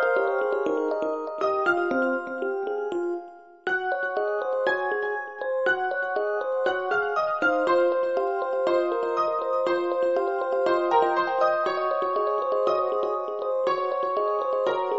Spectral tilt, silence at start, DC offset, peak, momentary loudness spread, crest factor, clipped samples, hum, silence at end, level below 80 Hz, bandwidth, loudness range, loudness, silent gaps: -1.5 dB/octave; 0 s; under 0.1%; -10 dBFS; 6 LU; 16 dB; under 0.1%; none; 0 s; -72 dBFS; 7.6 kHz; 3 LU; -25 LUFS; none